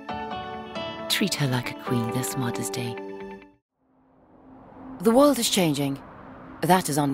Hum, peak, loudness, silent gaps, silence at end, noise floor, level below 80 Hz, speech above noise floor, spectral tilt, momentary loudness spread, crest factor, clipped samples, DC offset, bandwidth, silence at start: none; -8 dBFS; -25 LUFS; 3.62-3.69 s; 0 s; -62 dBFS; -58 dBFS; 39 dB; -4.5 dB/octave; 23 LU; 18 dB; under 0.1%; under 0.1%; 16 kHz; 0 s